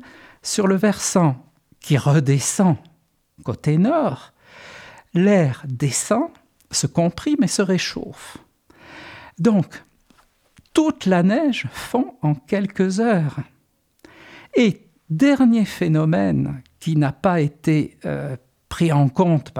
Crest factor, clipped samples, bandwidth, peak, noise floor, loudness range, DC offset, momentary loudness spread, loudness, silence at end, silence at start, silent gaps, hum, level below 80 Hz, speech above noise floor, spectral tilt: 16 dB; under 0.1%; 15.5 kHz; -4 dBFS; -64 dBFS; 4 LU; under 0.1%; 17 LU; -20 LUFS; 0 s; 0.45 s; none; none; -54 dBFS; 45 dB; -6 dB/octave